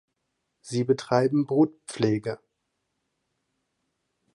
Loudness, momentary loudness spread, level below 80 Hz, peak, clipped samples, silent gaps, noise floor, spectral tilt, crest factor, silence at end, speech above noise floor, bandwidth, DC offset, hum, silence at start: -25 LUFS; 10 LU; -68 dBFS; -6 dBFS; under 0.1%; none; -79 dBFS; -6.5 dB/octave; 22 dB; 2 s; 54 dB; 11 kHz; under 0.1%; none; 0.65 s